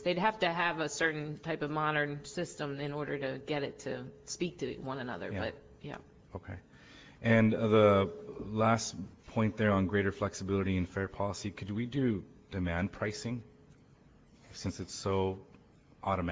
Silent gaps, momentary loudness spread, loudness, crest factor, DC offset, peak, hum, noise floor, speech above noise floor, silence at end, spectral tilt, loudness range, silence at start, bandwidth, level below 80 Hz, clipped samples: none; 16 LU; -33 LUFS; 20 dB; under 0.1%; -12 dBFS; none; -61 dBFS; 28 dB; 0 s; -5.5 dB/octave; 9 LU; 0 s; 8 kHz; -54 dBFS; under 0.1%